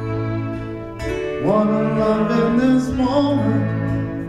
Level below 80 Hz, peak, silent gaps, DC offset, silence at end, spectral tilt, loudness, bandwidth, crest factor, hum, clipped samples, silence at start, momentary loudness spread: -38 dBFS; -6 dBFS; none; under 0.1%; 0 s; -8 dB/octave; -19 LUFS; 11 kHz; 12 dB; none; under 0.1%; 0 s; 10 LU